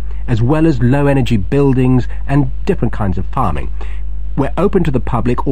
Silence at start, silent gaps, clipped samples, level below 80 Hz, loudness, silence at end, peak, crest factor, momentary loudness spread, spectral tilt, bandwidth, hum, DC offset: 0 s; none; under 0.1%; -22 dBFS; -15 LUFS; 0 s; 0 dBFS; 14 dB; 11 LU; -9 dB/octave; 10 kHz; 50 Hz at -25 dBFS; 10%